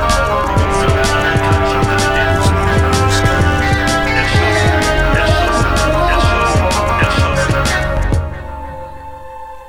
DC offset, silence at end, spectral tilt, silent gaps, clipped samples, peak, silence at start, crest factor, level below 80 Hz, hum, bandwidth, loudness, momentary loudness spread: 1%; 0 s; -5 dB/octave; none; under 0.1%; 0 dBFS; 0 s; 12 dB; -20 dBFS; none; 17 kHz; -13 LUFS; 14 LU